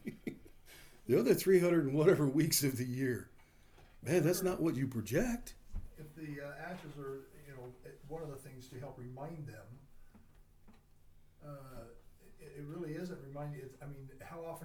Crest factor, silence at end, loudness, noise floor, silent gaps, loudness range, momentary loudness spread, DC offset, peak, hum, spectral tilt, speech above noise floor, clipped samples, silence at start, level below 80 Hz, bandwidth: 22 dB; 0 s; -35 LUFS; -61 dBFS; none; 20 LU; 23 LU; under 0.1%; -16 dBFS; none; -5.5 dB/octave; 26 dB; under 0.1%; 0.05 s; -58 dBFS; over 20 kHz